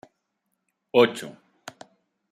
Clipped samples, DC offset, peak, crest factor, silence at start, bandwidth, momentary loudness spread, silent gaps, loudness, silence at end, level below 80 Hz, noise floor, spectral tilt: under 0.1%; under 0.1%; -6 dBFS; 22 dB; 0.95 s; 14 kHz; 24 LU; none; -22 LUFS; 1 s; -78 dBFS; -78 dBFS; -4.5 dB/octave